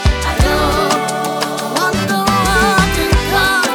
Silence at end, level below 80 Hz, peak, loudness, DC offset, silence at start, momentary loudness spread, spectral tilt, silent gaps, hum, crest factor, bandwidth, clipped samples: 0 s; -22 dBFS; 0 dBFS; -14 LUFS; under 0.1%; 0 s; 6 LU; -4 dB/octave; none; none; 12 dB; over 20 kHz; under 0.1%